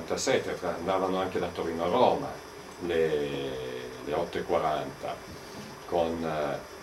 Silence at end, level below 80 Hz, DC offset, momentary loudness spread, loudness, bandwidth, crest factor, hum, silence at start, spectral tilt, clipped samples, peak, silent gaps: 0 s; -58 dBFS; under 0.1%; 14 LU; -30 LUFS; 16 kHz; 20 dB; none; 0 s; -4.5 dB/octave; under 0.1%; -10 dBFS; none